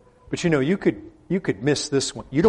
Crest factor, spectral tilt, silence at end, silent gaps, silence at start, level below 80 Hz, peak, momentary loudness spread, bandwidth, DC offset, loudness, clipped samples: 18 dB; -5 dB/octave; 0 s; none; 0.3 s; -52 dBFS; -6 dBFS; 7 LU; 11 kHz; under 0.1%; -23 LUFS; under 0.1%